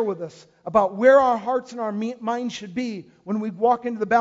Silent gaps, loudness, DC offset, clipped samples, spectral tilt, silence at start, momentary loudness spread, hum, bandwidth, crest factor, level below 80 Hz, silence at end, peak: none; -22 LUFS; under 0.1%; under 0.1%; -6 dB/octave; 0 s; 16 LU; none; 7.8 kHz; 18 dB; -62 dBFS; 0 s; -4 dBFS